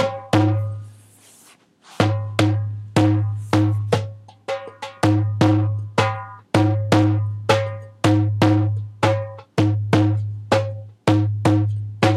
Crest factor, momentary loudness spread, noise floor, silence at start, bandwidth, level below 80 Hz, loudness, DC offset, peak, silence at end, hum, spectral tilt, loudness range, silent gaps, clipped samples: 20 dB; 12 LU; -52 dBFS; 0 s; 11.5 kHz; -52 dBFS; -20 LUFS; under 0.1%; 0 dBFS; 0 s; none; -7 dB/octave; 2 LU; none; under 0.1%